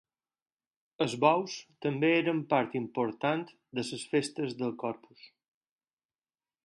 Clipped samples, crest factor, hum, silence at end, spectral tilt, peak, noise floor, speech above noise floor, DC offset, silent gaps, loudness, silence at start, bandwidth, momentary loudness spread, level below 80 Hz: under 0.1%; 24 dB; none; 1.4 s; -5.5 dB/octave; -10 dBFS; under -90 dBFS; over 59 dB; under 0.1%; none; -31 LUFS; 1 s; 11.5 kHz; 11 LU; -78 dBFS